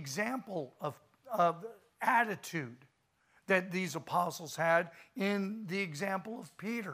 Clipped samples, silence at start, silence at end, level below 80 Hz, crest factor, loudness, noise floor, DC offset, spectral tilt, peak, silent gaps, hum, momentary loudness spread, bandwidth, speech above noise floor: under 0.1%; 0 s; 0 s; -84 dBFS; 22 dB; -34 LUFS; -73 dBFS; under 0.1%; -5 dB/octave; -14 dBFS; none; none; 12 LU; 15.5 kHz; 38 dB